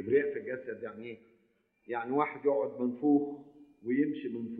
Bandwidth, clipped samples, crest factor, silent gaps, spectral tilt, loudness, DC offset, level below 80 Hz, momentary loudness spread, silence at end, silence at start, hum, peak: 4 kHz; under 0.1%; 18 dB; none; -10 dB/octave; -32 LUFS; under 0.1%; -78 dBFS; 16 LU; 0 s; 0 s; none; -14 dBFS